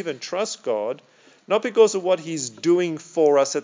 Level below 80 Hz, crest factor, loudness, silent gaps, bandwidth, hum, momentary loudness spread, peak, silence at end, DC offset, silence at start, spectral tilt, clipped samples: under -90 dBFS; 18 dB; -22 LUFS; none; 7.6 kHz; none; 10 LU; -4 dBFS; 0 s; under 0.1%; 0 s; -4 dB/octave; under 0.1%